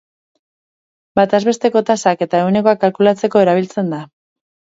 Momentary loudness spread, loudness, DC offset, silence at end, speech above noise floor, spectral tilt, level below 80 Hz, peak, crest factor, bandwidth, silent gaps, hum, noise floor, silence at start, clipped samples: 8 LU; -15 LUFS; under 0.1%; 0.75 s; over 76 dB; -6 dB/octave; -60 dBFS; 0 dBFS; 16 dB; 8 kHz; none; none; under -90 dBFS; 1.15 s; under 0.1%